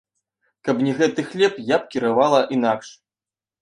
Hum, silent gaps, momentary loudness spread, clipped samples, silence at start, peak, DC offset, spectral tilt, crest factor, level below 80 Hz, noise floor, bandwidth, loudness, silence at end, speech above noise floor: none; none; 7 LU; under 0.1%; 0.65 s; -2 dBFS; under 0.1%; -5.5 dB/octave; 18 dB; -68 dBFS; under -90 dBFS; 10.5 kHz; -20 LUFS; 0.7 s; over 70 dB